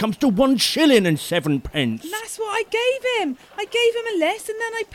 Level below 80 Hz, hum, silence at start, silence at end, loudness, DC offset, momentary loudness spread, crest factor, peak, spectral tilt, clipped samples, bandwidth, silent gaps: -48 dBFS; none; 0 s; 0 s; -20 LUFS; under 0.1%; 11 LU; 16 dB; -4 dBFS; -4.5 dB/octave; under 0.1%; 17 kHz; none